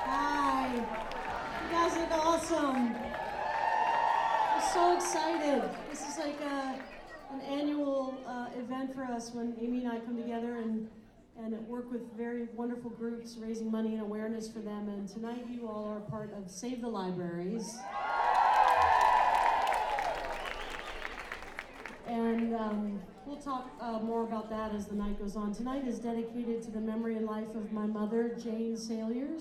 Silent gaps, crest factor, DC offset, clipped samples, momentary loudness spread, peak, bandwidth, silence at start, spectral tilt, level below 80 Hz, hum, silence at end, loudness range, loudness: none; 20 dB; under 0.1%; under 0.1%; 13 LU; -14 dBFS; 14.5 kHz; 0 s; -4.5 dB/octave; -56 dBFS; none; 0 s; 10 LU; -34 LUFS